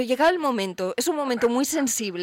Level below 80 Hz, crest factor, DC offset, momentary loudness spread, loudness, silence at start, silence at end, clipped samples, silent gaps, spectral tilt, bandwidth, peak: -62 dBFS; 12 dB; under 0.1%; 5 LU; -23 LUFS; 0 s; 0 s; under 0.1%; none; -3 dB/octave; 16.5 kHz; -12 dBFS